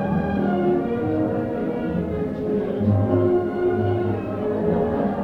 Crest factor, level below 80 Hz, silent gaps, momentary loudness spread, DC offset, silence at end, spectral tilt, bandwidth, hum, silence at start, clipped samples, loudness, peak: 16 dB; -44 dBFS; none; 6 LU; under 0.1%; 0 s; -10.5 dB/octave; 5.2 kHz; none; 0 s; under 0.1%; -22 LUFS; -6 dBFS